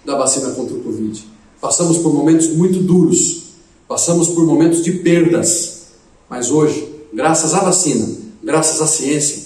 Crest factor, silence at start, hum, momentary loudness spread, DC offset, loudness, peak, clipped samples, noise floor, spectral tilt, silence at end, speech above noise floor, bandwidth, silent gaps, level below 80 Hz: 14 dB; 0.05 s; none; 12 LU; under 0.1%; -14 LUFS; 0 dBFS; under 0.1%; -45 dBFS; -4.5 dB/octave; 0 s; 31 dB; 14 kHz; none; -54 dBFS